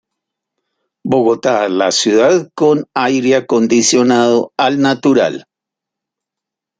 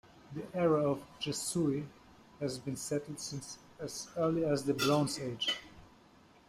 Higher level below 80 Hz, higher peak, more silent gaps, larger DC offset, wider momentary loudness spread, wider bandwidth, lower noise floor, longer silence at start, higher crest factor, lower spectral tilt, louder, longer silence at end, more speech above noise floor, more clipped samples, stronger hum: first, -60 dBFS vs -68 dBFS; first, 0 dBFS vs -16 dBFS; neither; neither; second, 5 LU vs 14 LU; second, 9.6 kHz vs 15.5 kHz; first, -83 dBFS vs -61 dBFS; first, 1.05 s vs 0.15 s; about the same, 14 dB vs 18 dB; about the same, -4 dB/octave vs -4.5 dB/octave; first, -13 LUFS vs -34 LUFS; first, 1.4 s vs 0.6 s; first, 71 dB vs 27 dB; neither; neither